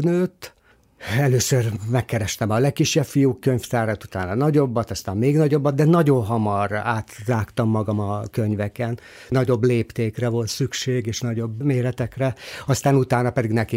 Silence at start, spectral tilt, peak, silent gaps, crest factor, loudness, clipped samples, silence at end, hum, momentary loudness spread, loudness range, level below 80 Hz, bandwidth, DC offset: 0 s; -6 dB/octave; -6 dBFS; none; 16 dB; -22 LUFS; under 0.1%; 0 s; none; 8 LU; 3 LU; -52 dBFS; 16 kHz; under 0.1%